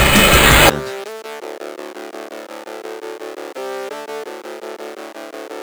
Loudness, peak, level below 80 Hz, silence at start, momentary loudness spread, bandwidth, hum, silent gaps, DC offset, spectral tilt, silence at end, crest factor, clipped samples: -12 LUFS; 0 dBFS; -28 dBFS; 0 s; 23 LU; over 20 kHz; none; none; under 0.1%; -3 dB/octave; 0 s; 18 dB; under 0.1%